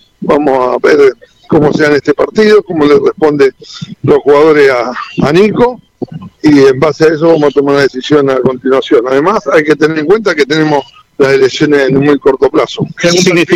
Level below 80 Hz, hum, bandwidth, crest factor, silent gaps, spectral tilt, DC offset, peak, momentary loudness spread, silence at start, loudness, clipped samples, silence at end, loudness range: -42 dBFS; none; 11.5 kHz; 8 dB; none; -5.5 dB/octave; under 0.1%; 0 dBFS; 7 LU; 0.2 s; -8 LUFS; 0.2%; 0 s; 1 LU